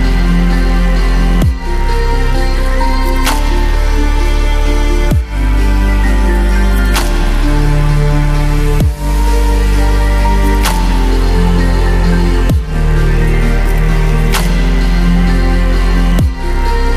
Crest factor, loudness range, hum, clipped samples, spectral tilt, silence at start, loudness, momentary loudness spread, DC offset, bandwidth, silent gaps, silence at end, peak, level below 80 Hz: 10 dB; 2 LU; none; under 0.1%; -6 dB/octave; 0 s; -13 LUFS; 3 LU; under 0.1%; 14.5 kHz; none; 0 s; 0 dBFS; -10 dBFS